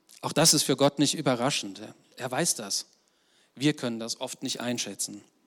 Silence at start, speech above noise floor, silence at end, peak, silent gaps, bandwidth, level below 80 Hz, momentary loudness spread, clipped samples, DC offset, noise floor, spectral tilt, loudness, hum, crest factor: 0.1 s; 38 dB; 0.25 s; -10 dBFS; none; 19 kHz; -74 dBFS; 15 LU; under 0.1%; under 0.1%; -66 dBFS; -3 dB/octave; -27 LUFS; none; 18 dB